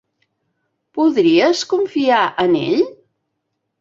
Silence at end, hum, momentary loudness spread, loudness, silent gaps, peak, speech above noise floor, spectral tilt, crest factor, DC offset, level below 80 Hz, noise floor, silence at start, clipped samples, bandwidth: 0.85 s; none; 6 LU; -16 LUFS; none; -2 dBFS; 59 dB; -4.5 dB/octave; 16 dB; under 0.1%; -62 dBFS; -74 dBFS; 0.95 s; under 0.1%; 7.6 kHz